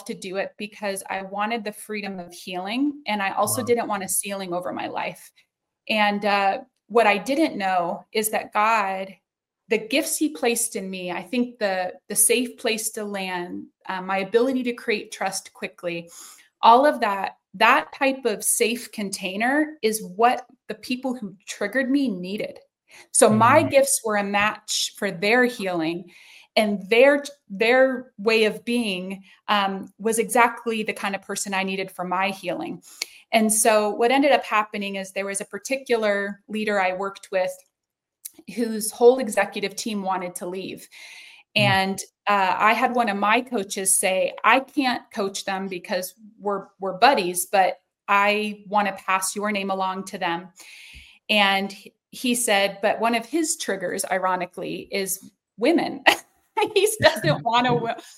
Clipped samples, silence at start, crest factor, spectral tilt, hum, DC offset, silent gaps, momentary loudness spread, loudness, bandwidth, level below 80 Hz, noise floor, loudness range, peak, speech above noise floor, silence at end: under 0.1%; 0 s; 22 dB; -3 dB/octave; none; under 0.1%; none; 14 LU; -22 LUFS; 16.5 kHz; -66 dBFS; -85 dBFS; 5 LU; 0 dBFS; 62 dB; 0.05 s